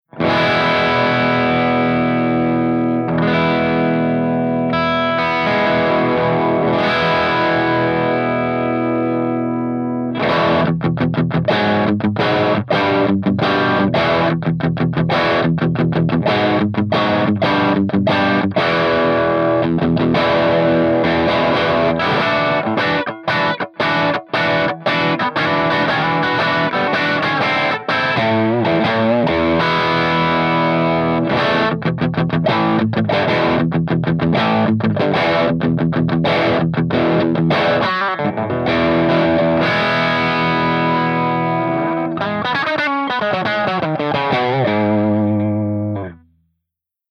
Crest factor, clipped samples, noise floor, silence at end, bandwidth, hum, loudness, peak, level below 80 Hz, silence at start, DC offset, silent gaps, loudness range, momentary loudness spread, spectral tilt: 12 dB; under 0.1%; -81 dBFS; 0.95 s; 6.8 kHz; none; -16 LUFS; -4 dBFS; -50 dBFS; 0.15 s; under 0.1%; none; 2 LU; 3 LU; -7.5 dB/octave